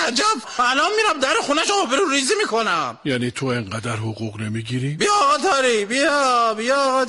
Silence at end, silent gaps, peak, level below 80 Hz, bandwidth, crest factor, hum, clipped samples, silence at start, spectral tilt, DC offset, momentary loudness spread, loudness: 0 s; none; -8 dBFS; -58 dBFS; 11.5 kHz; 12 dB; none; under 0.1%; 0 s; -3.5 dB/octave; under 0.1%; 9 LU; -19 LUFS